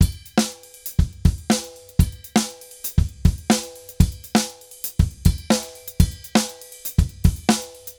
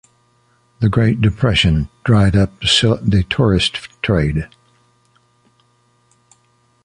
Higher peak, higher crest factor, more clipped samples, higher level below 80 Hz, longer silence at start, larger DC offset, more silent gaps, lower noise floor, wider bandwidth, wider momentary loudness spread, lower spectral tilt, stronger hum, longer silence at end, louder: about the same, 0 dBFS vs -2 dBFS; about the same, 20 dB vs 16 dB; neither; first, -26 dBFS vs -32 dBFS; second, 0 s vs 0.8 s; neither; neither; second, -37 dBFS vs -58 dBFS; first, over 20 kHz vs 11 kHz; first, 10 LU vs 7 LU; about the same, -5 dB/octave vs -5.5 dB/octave; neither; second, 0.05 s vs 2.4 s; second, -22 LUFS vs -15 LUFS